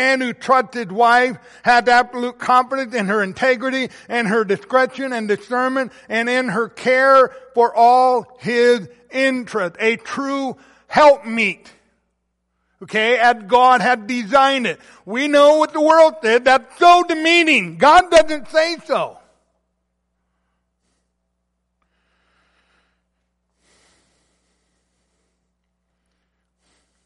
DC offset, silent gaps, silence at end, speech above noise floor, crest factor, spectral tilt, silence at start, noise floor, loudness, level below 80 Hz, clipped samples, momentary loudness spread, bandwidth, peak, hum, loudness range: under 0.1%; none; 7.95 s; 57 dB; 16 dB; -4 dB/octave; 0 s; -72 dBFS; -16 LUFS; -54 dBFS; under 0.1%; 11 LU; 11.5 kHz; -2 dBFS; none; 6 LU